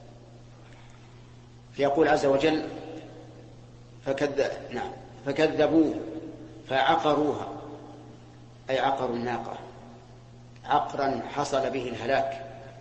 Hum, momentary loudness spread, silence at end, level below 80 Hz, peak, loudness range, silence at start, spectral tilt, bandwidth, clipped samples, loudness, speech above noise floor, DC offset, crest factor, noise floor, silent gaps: none; 22 LU; 0 s; -56 dBFS; -10 dBFS; 5 LU; 0 s; -5.5 dB/octave; 8.6 kHz; under 0.1%; -27 LUFS; 23 dB; under 0.1%; 18 dB; -49 dBFS; none